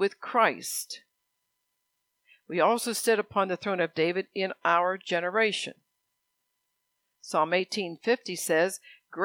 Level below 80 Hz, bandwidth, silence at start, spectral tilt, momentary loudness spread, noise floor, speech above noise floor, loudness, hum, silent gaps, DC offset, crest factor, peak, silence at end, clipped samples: -82 dBFS; 19 kHz; 0 s; -3 dB/octave; 9 LU; -80 dBFS; 52 dB; -27 LUFS; none; none; under 0.1%; 22 dB; -8 dBFS; 0 s; under 0.1%